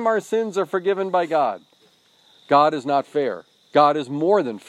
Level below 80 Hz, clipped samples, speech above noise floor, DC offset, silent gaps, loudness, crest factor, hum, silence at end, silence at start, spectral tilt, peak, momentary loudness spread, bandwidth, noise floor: -78 dBFS; under 0.1%; 38 dB; under 0.1%; none; -21 LUFS; 18 dB; none; 0.1 s; 0 s; -6 dB/octave; -2 dBFS; 8 LU; 13 kHz; -58 dBFS